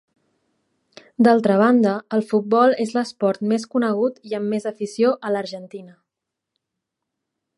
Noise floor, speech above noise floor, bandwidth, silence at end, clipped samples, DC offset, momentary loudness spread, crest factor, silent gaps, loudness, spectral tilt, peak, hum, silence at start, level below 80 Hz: -83 dBFS; 64 dB; 11.5 kHz; 1.7 s; under 0.1%; under 0.1%; 13 LU; 18 dB; none; -20 LUFS; -6.5 dB/octave; -2 dBFS; none; 1.2 s; -74 dBFS